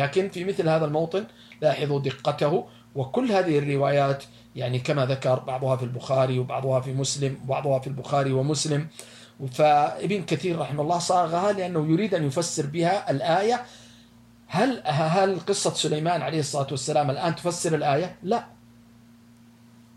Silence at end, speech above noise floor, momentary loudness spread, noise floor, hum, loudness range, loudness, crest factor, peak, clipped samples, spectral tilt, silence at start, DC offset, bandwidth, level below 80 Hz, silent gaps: 1.5 s; 28 dB; 7 LU; -53 dBFS; none; 2 LU; -25 LUFS; 16 dB; -10 dBFS; under 0.1%; -5.5 dB/octave; 0 s; under 0.1%; 13.5 kHz; -64 dBFS; none